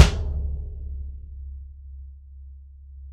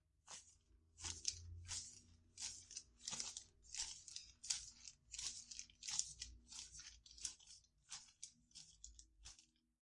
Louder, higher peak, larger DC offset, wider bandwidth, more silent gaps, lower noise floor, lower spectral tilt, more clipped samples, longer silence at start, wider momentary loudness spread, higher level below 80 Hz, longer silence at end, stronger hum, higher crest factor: first, -29 LUFS vs -50 LUFS; first, 0 dBFS vs -18 dBFS; neither; about the same, 12 kHz vs 12 kHz; neither; second, -43 dBFS vs -73 dBFS; first, -5 dB/octave vs 0.5 dB/octave; neither; second, 0 s vs 0.25 s; about the same, 16 LU vs 16 LU; first, -30 dBFS vs -72 dBFS; second, 0 s vs 0.35 s; neither; second, 24 dB vs 36 dB